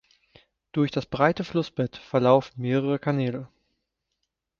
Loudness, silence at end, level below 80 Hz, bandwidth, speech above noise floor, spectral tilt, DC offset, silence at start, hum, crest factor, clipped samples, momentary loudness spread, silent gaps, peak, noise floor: -25 LUFS; 1.15 s; -60 dBFS; 7.2 kHz; 56 dB; -8 dB/octave; under 0.1%; 0.75 s; none; 22 dB; under 0.1%; 10 LU; none; -4 dBFS; -80 dBFS